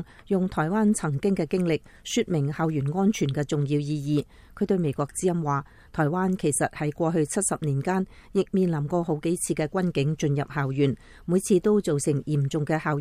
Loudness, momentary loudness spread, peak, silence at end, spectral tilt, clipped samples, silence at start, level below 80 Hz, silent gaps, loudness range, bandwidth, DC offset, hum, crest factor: -26 LUFS; 5 LU; -10 dBFS; 0 s; -6 dB/octave; under 0.1%; 0 s; -52 dBFS; none; 2 LU; 14.5 kHz; under 0.1%; none; 14 dB